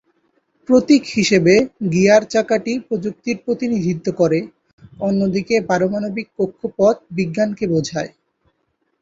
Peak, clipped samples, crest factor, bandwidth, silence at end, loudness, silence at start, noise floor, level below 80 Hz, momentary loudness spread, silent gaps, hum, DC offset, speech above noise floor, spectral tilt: -2 dBFS; under 0.1%; 16 dB; 8 kHz; 0.95 s; -18 LUFS; 0.7 s; -69 dBFS; -56 dBFS; 11 LU; 4.73-4.78 s; none; under 0.1%; 52 dB; -5.5 dB/octave